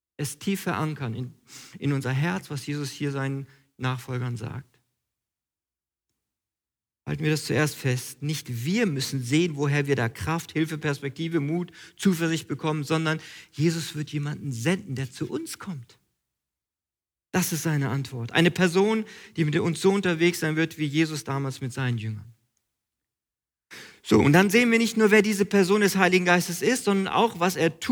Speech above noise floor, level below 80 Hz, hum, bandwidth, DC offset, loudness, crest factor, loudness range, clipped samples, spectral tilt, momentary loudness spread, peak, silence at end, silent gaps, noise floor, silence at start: over 65 dB; -62 dBFS; none; over 20 kHz; under 0.1%; -25 LUFS; 20 dB; 12 LU; under 0.1%; -5.5 dB/octave; 14 LU; -6 dBFS; 0 s; none; under -90 dBFS; 0.2 s